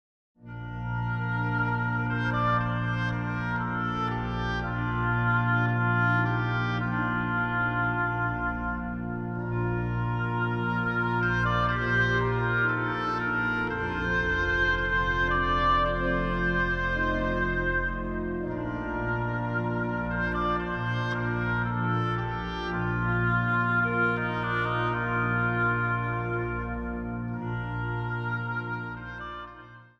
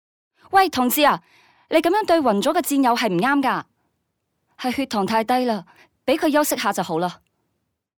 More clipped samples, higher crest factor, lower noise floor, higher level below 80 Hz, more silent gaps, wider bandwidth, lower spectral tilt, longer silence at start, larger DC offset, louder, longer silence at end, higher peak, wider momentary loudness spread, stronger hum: neither; about the same, 14 dB vs 18 dB; second, -48 dBFS vs -75 dBFS; first, -40 dBFS vs -62 dBFS; neither; second, 6.6 kHz vs over 20 kHz; first, -7.5 dB/octave vs -4 dB/octave; about the same, 0.4 s vs 0.5 s; neither; second, -28 LUFS vs -20 LUFS; second, 0.15 s vs 0.85 s; second, -14 dBFS vs -4 dBFS; about the same, 8 LU vs 9 LU; neither